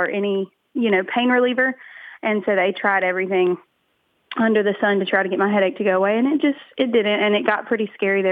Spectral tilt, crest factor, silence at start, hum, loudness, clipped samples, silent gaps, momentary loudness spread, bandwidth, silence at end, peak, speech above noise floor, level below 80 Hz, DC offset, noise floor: -8 dB/octave; 16 dB; 0 s; none; -20 LUFS; under 0.1%; none; 6 LU; 4.8 kHz; 0 s; -4 dBFS; 48 dB; -74 dBFS; under 0.1%; -67 dBFS